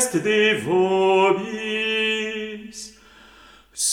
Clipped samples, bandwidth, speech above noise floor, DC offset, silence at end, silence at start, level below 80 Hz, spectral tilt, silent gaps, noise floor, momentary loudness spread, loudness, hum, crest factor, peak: under 0.1%; 16.5 kHz; 30 dB; under 0.1%; 0 s; 0 s; -60 dBFS; -3 dB/octave; none; -49 dBFS; 19 LU; -20 LUFS; none; 16 dB; -6 dBFS